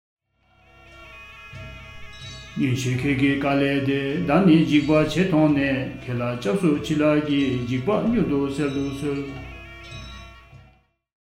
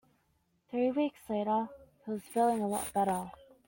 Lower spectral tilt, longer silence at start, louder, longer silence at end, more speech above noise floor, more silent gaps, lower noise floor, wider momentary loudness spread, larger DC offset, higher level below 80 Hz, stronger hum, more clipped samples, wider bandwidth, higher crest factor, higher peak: first, -7 dB/octave vs -5.5 dB/octave; first, 0.9 s vs 0.7 s; first, -21 LUFS vs -33 LUFS; first, 0.7 s vs 0.35 s; second, 39 dB vs 43 dB; neither; second, -60 dBFS vs -75 dBFS; first, 21 LU vs 12 LU; neither; first, -46 dBFS vs -68 dBFS; neither; neither; second, 12 kHz vs 17 kHz; about the same, 18 dB vs 18 dB; first, -6 dBFS vs -16 dBFS